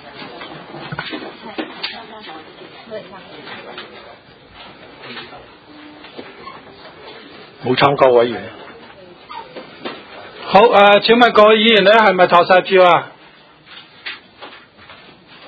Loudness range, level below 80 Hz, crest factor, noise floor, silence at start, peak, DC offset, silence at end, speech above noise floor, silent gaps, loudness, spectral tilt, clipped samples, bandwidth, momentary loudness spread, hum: 24 LU; -56 dBFS; 16 dB; -45 dBFS; 0.15 s; 0 dBFS; under 0.1%; 1 s; 33 dB; none; -11 LUFS; -6 dB/octave; under 0.1%; 8 kHz; 26 LU; none